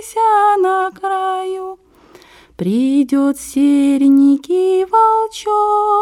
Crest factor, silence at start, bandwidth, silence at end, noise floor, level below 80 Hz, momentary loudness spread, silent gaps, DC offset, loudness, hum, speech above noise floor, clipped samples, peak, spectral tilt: 10 dB; 0 s; 13.5 kHz; 0 s; -45 dBFS; -56 dBFS; 8 LU; none; under 0.1%; -14 LUFS; none; 32 dB; under 0.1%; -4 dBFS; -5.5 dB/octave